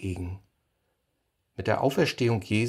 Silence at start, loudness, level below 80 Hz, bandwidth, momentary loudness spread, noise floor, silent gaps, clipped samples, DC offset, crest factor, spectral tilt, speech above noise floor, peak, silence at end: 0 s; -27 LUFS; -54 dBFS; 14.5 kHz; 18 LU; -76 dBFS; none; under 0.1%; under 0.1%; 20 dB; -6 dB/octave; 50 dB; -8 dBFS; 0 s